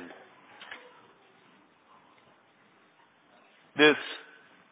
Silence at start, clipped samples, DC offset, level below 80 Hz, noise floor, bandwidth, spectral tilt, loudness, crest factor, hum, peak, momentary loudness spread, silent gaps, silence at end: 0 s; under 0.1%; under 0.1%; -88 dBFS; -63 dBFS; 4 kHz; -1 dB/octave; -25 LUFS; 28 dB; none; -6 dBFS; 27 LU; none; 0.55 s